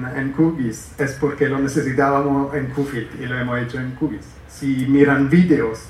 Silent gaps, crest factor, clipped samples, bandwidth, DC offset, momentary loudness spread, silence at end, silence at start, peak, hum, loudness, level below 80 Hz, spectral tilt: none; 18 dB; under 0.1%; 13.5 kHz; under 0.1%; 12 LU; 0 s; 0 s; -2 dBFS; none; -19 LUFS; -44 dBFS; -7 dB/octave